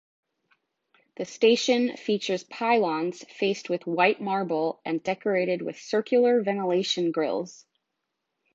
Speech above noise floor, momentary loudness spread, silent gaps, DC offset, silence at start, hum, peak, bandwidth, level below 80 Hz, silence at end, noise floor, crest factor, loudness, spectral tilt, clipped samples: 56 dB; 9 LU; none; under 0.1%; 1.2 s; none; -6 dBFS; 7.8 kHz; -80 dBFS; 1 s; -82 dBFS; 20 dB; -25 LUFS; -4.5 dB/octave; under 0.1%